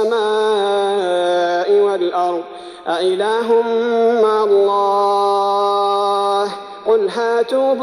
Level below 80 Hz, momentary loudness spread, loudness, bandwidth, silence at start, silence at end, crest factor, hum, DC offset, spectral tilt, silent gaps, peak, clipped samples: -66 dBFS; 6 LU; -16 LUFS; 11.5 kHz; 0 s; 0 s; 10 dB; none; under 0.1%; -4 dB/octave; none; -4 dBFS; under 0.1%